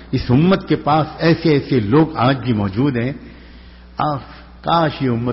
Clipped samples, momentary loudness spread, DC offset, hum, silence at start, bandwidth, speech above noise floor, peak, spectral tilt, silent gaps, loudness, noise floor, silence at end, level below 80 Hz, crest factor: under 0.1%; 10 LU; under 0.1%; none; 0 s; 6 kHz; 24 dB; -4 dBFS; -6 dB/octave; none; -17 LUFS; -40 dBFS; 0 s; -40 dBFS; 14 dB